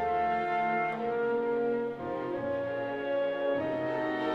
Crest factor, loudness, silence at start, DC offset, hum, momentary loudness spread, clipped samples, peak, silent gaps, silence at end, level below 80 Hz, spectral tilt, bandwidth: 12 dB; -31 LUFS; 0 s; under 0.1%; none; 4 LU; under 0.1%; -18 dBFS; none; 0 s; -64 dBFS; -7 dB/octave; 7.4 kHz